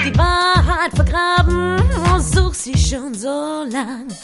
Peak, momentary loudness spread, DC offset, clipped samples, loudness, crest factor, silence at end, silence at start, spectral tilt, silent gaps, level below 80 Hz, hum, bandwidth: 0 dBFS; 9 LU; 0.3%; under 0.1%; -17 LUFS; 16 dB; 0 s; 0 s; -5 dB/octave; none; -20 dBFS; none; 11.5 kHz